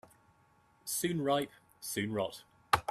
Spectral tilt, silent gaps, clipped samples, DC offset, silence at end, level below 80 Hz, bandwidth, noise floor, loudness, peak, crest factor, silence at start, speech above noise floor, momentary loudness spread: -4 dB/octave; none; under 0.1%; under 0.1%; 0.1 s; -64 dBFS; 15.5 kHz; -68 dBFS; -35 LUFS; -8 dBFS; 28 dB; 0.85 s; 33 dB; 13 LU